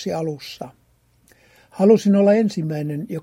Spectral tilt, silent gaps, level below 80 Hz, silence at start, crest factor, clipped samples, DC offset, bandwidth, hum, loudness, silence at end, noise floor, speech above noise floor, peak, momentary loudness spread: -7.5 dB/octave; none; -64 dBFS; 0 s; 18 dB; under 0.1%; under 0.1%; 13.5 kHz; none; -18 LUFS; 0 s; -59 dBFS; 40 dB; -2 dBFS; 20 LU